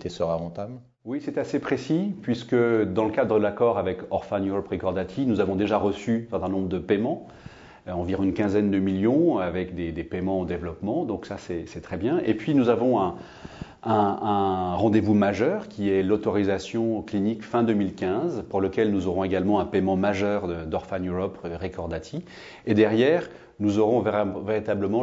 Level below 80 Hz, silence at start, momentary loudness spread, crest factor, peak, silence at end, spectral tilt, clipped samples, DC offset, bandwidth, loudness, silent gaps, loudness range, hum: -52 dBFS; 0 s; 12 LU; 18 dB; -6 dBFS; 0 s; -7.5 dB/octave; under 0.1%; under 0.1%; 7.8 kHz; -25 LUFS; none; 3 LU; none